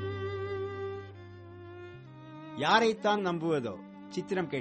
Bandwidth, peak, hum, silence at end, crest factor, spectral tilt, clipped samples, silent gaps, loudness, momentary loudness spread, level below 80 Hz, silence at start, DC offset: 8.4 kHz; -12 dBFS; none; 0 s; 22 dB; -5.5 dB/octave; under 0.1%; none; -31 LUFS; 23 LU; -68 dBFS; 0 s; under 0.1%